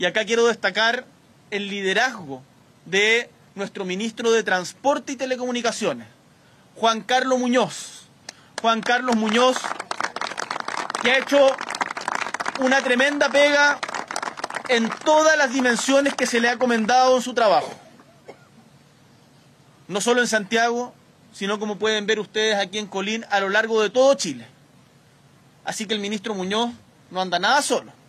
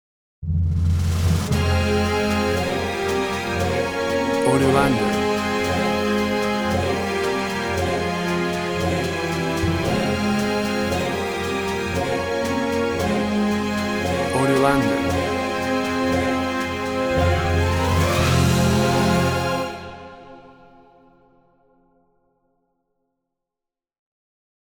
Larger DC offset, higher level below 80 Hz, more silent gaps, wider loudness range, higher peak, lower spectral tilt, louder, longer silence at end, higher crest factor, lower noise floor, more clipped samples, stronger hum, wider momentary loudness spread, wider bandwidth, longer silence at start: neither; second, -70 dBFS vs -36 dBFS; neither; first, 6 LU vs 3 LU; about the same, -6 dBFS vs -4 dBFS; second, -2.5 dB/octave vs -5.5 dB/octave; about the same, -21 LUFS vs -21 LUFS; second, 0.15 s vs 4.15 s; about the same, 16 dB vs 18 dB; second, -54 dBFS vs -87 dBFS; neither; neither; first, 12 LU vs 6 LU; second, 13.5 kHz vs over 20 kHz; second, 0 s vs 0.4 s